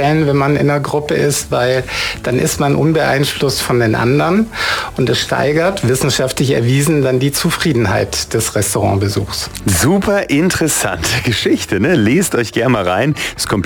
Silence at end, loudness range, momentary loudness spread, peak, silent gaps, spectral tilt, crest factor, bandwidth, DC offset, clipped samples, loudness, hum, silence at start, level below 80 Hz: 0 s; 1 LU; 4 LU; -4 dBFS; none; -4.5 dB/octave; 10 dB; 18 kHz; under 0.1%; under 0.1%; -14 LUFS; none; 0 s; -36 dBFS